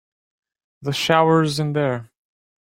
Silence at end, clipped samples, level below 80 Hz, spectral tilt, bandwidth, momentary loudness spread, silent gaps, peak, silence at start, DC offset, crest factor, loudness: 0.55 s; under 0.1%; -60 dBFS; -5.5 dB/octave; 16 kHz; 13 LU; none; -2 dBFS; 0.8 s; under 0.1%; 20 dB; -19 LUFS